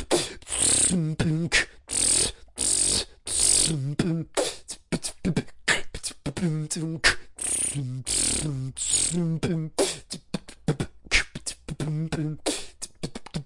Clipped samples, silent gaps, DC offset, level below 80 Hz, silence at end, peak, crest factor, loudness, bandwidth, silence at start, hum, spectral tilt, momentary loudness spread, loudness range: under 0.1%; none; under 0.1%; -44 dBFS; 0 s; -4 dBFS; 22 dB; -25 LUFS; 11.5 kHz; 0 s; none; -2.5 dB/octave; 13 LU; 6 LU